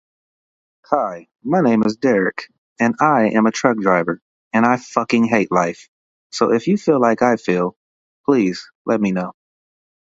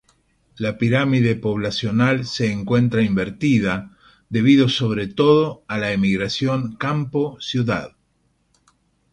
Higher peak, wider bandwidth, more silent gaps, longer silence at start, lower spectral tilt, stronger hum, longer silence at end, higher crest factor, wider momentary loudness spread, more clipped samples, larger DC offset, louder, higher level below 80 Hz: about the same, 0 dBFS vs -2 dBFS; second, 7.8 kHz vs 10.5 kHz; first, 2.58-2.76 s, 4.22-4.51 s, 5.88-6.30 s, 7.76-8.24 s, 8.75-8.85 s vs none; first, 0.9 s vs 0.55 s; about the same, -6 dB/octave vs -6.5 dB/octave; neither; second, 0.85 s vs 1.25 s; about the same, 18 dB vs 18 dB; first, 11 LU vs 8 LU; neither; neither; about the same, -18 LUFS vs -20 LUFS; second, -60 dBFS vs -50 dBFS